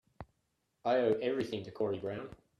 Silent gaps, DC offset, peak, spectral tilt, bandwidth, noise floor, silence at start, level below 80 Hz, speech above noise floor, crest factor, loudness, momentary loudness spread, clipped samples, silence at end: none; under 0.1%; -18 dBFS; -7 dB/octave; 12 kHz; -80 dBFS; 0.2 s; -68 dBFS; 47 dB; 18 dB; -35 LUFS; 25 LU; under 0.1%; 0.25 s